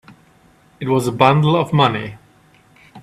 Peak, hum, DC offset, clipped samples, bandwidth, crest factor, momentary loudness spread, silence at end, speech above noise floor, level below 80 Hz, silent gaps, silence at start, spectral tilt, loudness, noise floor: 0 dBFS; none; under 0.1%; under 0.1%; 13.5 kHz; 18 dB; 14 LU; 0 s; 37 dB; -54 dBFS; none; 0.8 s; -6.5 dB/octave; -16 LUFS; -52 dBFS